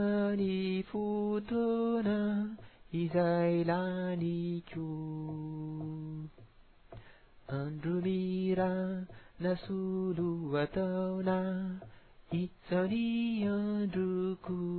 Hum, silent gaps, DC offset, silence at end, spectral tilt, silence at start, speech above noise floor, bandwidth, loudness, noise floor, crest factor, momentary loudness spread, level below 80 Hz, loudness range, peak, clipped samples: none; none; under 0.1%; 0 s; -7 dB/octave; 0 s; 26 dB; 4.5 kHz; -34 LUFS; -59 dBFS; 16 dB; 10 LU; -62 dBFS; 7 LU; -18 dBFS; under 0.1%